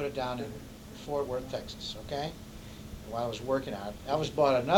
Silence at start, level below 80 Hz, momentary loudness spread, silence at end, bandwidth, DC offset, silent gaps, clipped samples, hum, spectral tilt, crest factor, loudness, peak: 0 s; -52 dBFS; 18 LU; 0 s; 19 kHz; under 0.1%; none; under 0.1%; none; -5.5 dB/octave; 22 dB; -34 LUFS; -10 dBFS